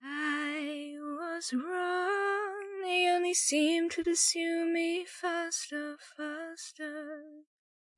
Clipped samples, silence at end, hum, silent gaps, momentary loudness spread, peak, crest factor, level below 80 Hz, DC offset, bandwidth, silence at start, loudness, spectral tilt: under 0.1%; 0.55 s; none; none; 14 LU; -14 dBFS; 18 dB; -76 dBFS; under 0.1%; 11.5 kHz; 0 s; -32 LUFS; 0 dB/octave